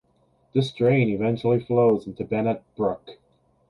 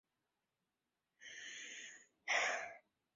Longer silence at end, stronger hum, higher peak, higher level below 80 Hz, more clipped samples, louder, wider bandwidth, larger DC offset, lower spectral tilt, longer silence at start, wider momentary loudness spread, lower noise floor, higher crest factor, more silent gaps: first, 0.55 s vs 0.35 s; neither; first, -8 dBFS vs -24 dBFS; first, -58 dBFS vs under -90 dBFS; neither; first, -23 LUFS vs -42 LUFS; first, 11 kHz vs 7.4 kHz; neither; first, -8.5 dB/octave vs 3.5 dB/octave; second, 0.55 s vs 1.2 s; second, 7 LU vs 20 LU; second, -64 dBFS vs under -90 dBFS; second, 16 dB vs 24 dB; neither